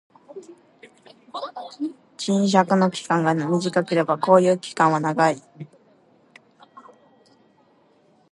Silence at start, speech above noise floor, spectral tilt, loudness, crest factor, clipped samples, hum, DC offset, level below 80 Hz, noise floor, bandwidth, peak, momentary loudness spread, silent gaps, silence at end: 0.35 s; 38 dB; -6 dB/octave; -21 LUFS; 22 dB; under 0.1%; none; under 0.1%; -74 dBFS; -59 dBFS; 11.5 kHz; -2 dBFS; 25 LU; none; 2.65 s